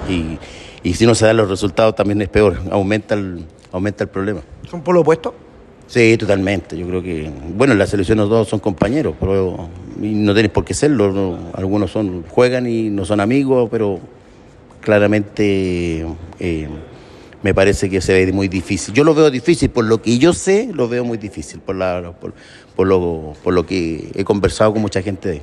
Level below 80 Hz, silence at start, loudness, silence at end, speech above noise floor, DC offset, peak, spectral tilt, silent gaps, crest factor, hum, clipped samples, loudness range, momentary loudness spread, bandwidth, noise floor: -38 dBFS; 0 s; -16 LUFS; 0 s; 27 dB; under 0.1%; 0 dBFS; -6 dB/octave; none; 16 dB; none; under 0.1%; 4 LU; 13 LU; 12 kHz; -42 dBFS